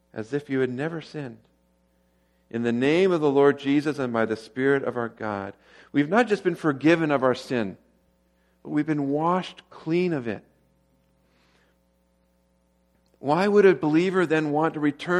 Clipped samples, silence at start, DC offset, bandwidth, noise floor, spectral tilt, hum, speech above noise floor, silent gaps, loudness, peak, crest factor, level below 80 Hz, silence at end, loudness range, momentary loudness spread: under 0.1%; 0.15 s; under 0.1%; 11.5 kHz; -66 dBFS; -7 dB/octave; none; 43 dB; none; -24 LUFS; -6 dBFS; 20 dB; -68 dBFS; 0 s; 8 LU; 14 LU